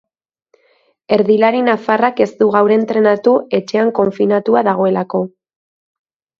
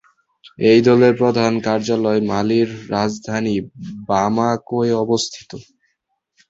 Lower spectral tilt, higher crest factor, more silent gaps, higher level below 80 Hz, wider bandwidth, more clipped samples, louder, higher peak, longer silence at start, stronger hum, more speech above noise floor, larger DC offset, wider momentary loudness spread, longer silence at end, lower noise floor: about the same, -7 dB/octave vs -6 dB/octave; about the same, 14 dB vs 16 dB; neither; second, -60 dBFS vs -54 dBFS; second, 7 kHz vs 8 kHz; neither; first, -14 LUFS vs -17 LUFS; about the same, 0 dBFS vs -2 dBFS; first, 1.1 s vs 0.45 s; neither; second, 44 dB vs 54 dB; neither; second, 6 LU vs 12 LU; first, 1.1 s vs 0.9 s; second, -57 dBFS vs -71 dBFS